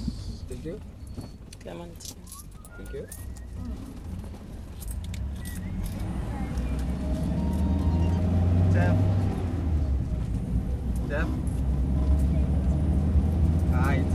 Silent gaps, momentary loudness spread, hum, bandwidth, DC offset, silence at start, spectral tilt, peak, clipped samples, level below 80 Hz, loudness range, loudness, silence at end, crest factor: none; 17 LU; none; 15.5 kHz; under 0.1%; 0 s; -7.5 dB/octave; -12 dBFS; under 0.1%; -30 dBFS; 14 LU; -28 LUFS; 0 s; 14 dB